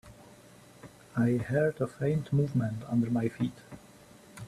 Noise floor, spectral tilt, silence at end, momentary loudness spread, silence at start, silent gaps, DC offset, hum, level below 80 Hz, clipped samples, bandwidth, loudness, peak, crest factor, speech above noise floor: -55 dBFS; -8.5 dB/octave; 0 s; 22 LU; 0.05 s; none; under 0.1%; none; -62 dBFS; under 0.1%; 14 kHz; -30 LUFS; -16 dBFS; 16 dB; 25 dB